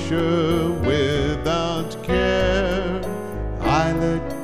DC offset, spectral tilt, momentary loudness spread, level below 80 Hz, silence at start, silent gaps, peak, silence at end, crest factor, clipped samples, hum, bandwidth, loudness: 1%; -6 dB/octave; 7 LU; -32 dBFS; 0 s; none; -6 dBFS; 0 s; 14 dB; under 0.1%; none; 15.5 kHz; -21 LUFS